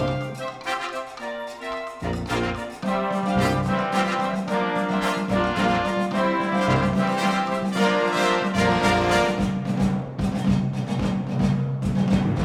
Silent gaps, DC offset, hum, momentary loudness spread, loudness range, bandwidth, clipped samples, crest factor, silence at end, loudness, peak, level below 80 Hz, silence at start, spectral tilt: none; under 0.1%; none; 9 LU; 5 LU; 14 kHz; under 0.1%; 18 dB; 0 s; -23 LUFS; -6 dBFS; -42 dBFS; 0 s; -6 dB/octave